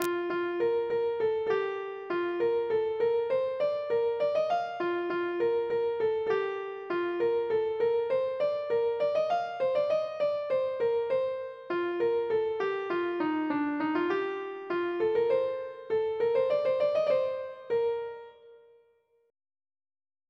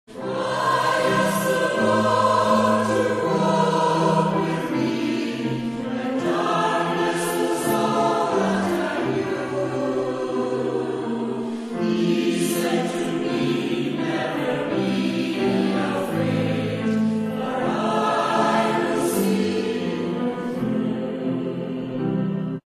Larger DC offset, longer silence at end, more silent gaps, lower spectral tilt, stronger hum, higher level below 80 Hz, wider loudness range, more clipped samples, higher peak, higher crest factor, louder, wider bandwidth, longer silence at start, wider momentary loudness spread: neither; first, 1.75 s vs 0.05 s; neither; about the same, -5.5 dB/octave vs -5.5 dB/octave; neither; second, -74 dBFS vs -60 dBFS; second, 1 LU vs 4 LU; neither; about the same, -8 dBFS vs -6 dBFS; about the same, 20 dB vs 16 dB; second, -30 LUFS vs -22 LUFS; second, 11.5 kHz vs 15 kHz; about the same, 0 s vs 0.1 s; about the same, 6 LU vs 7 LU